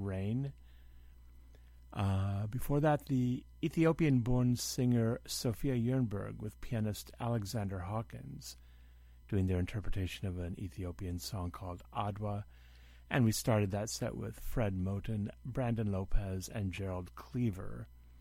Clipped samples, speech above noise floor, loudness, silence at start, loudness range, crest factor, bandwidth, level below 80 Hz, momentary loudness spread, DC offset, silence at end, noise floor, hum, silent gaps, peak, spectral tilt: under 0.1%; 22 dB; -36 LUFS; 0 s; 7 LU; 18 dB; 16.5 kHz; -48 dBFS; 13 LU; under 0.1%; 0 s; -57 dBFS; none; none; -16 dBFS; -6.5 dB/octave